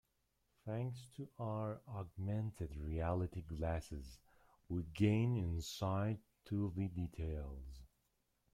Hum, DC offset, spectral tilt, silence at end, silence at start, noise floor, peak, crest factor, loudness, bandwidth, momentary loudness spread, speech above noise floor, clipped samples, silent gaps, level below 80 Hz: none; under 0.1%; -7.5 dB/octave; 0.65 s; 0.65 s; -82 dBFS; -22 dBFS; 20 dB; -42 LUFS; 14.5 kHz; 15 LU; 41 dB; under 0.1%; none; -56 dBFS